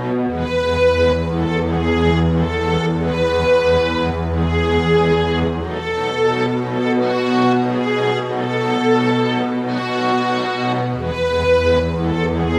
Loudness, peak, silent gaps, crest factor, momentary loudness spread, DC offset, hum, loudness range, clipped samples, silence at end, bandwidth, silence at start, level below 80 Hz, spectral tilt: -18 LUFS; -4 dBFS; none; 14 dB; 6 LU; under 0.1%; none; 1 LU; under 0.1%; 0 s; 11 kHz; 0 s; -32 dBFS; -7 dB/octave